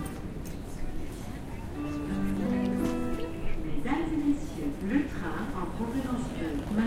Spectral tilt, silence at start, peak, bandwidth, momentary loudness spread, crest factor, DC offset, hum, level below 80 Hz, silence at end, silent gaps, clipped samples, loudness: -7 dB/octave; 0 s; -14 dBFS; 16 kHz; 11 LU; 16 dB; under 0.1%; none; -38 dBFS; 0 s; none; under 0.1%; -33 LUFS